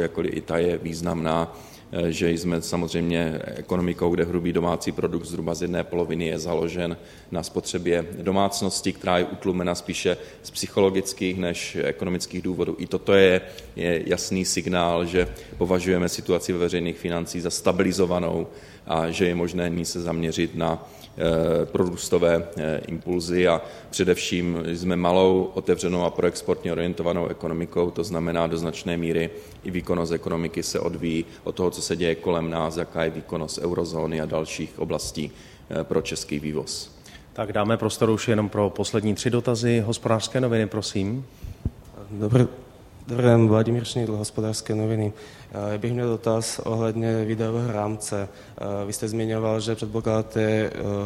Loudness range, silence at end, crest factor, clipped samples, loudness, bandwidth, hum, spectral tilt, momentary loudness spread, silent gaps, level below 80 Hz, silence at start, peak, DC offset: 4 LU; 0 s; 20 dB; under 0.1%; -25 LUFS; 16 kHz; none; -5.5 dB/octave; 9 LU; none; -50 dBFS; 0 s; -4 dBFS; under 0.1%